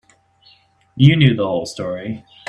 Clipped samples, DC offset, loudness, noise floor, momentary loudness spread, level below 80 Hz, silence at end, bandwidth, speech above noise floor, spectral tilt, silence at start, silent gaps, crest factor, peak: under 0.1%; under 0.1%; -16 LUFS; -54 dBFS; 15 LU; -52 dBFS; 0.3 s; 10 kHz; 38 dB; -7 dB/octave; 0.95 s; none; 18 dB; 0 dBFS